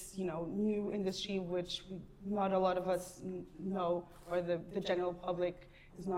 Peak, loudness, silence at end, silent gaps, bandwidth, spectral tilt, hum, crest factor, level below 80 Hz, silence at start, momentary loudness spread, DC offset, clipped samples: -20 dBFS; -38 LUFS; 0 s; none; 16 kHz; -5.5 dB/octave; none; 18 dB; -62 dBFS; 0 s; 12 LU; under 0.1%; under 0.1%